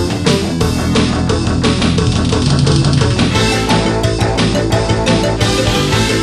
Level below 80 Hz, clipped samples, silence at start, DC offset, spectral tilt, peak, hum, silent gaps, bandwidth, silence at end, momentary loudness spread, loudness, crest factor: -24 dBFS; under 0.1%; 0 s; under 0.1%; -5 dB/octave; 0 dBFS; none; none; 13.5 kHz; 0 s; 3 LU; -13 LUFS; 12 dB